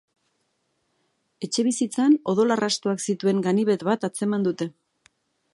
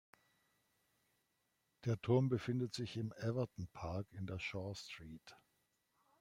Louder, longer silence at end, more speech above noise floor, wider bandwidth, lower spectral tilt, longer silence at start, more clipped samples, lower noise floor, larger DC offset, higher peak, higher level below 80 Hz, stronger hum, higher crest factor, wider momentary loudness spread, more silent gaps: first, -23 LUFS vs -41 LUFS; about the same, 0.85 s vs 0.85 s; first, 50 dB vs 43 dB; about the same, 11.5 kHz vs 12 kHz; second, -5 dB/octave vs -7 dB/octave; second, 1.4 s vs 1.85 s; neither; second, -73 dBFS vs -83 dBFS; neither; first, -8 dBFS vs -22 dBFS; about the same, -74 dBFS vs -70 dBFS; neither; second, 16 dB vs 22 dB; second, 7 LU vs 15 LU; neither